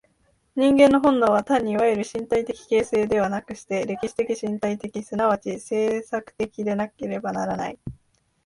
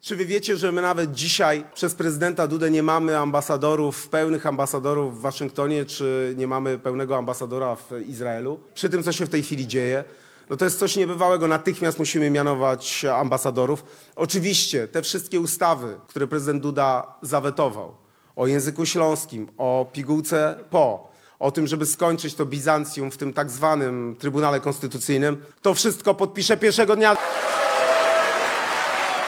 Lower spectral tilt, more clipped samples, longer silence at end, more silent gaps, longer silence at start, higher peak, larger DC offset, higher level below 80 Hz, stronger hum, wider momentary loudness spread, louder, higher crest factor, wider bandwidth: first, -6 dB/octave vs -4 dB/octave; neither; first, 0.55 s vs 0 s; neither; first, 0.55 s vs 0.05 s; about the same, -4 dBFS vs -2 dBFS; neither; first, -56 dBFS vs -68 dBFS; neither; first, 13 LU vs 8 LU; about the same, -23 LUFS vs -23 LUFS; about the same, 20 dB vs 22 dB; second, 11.5 kHz vs 18 kHz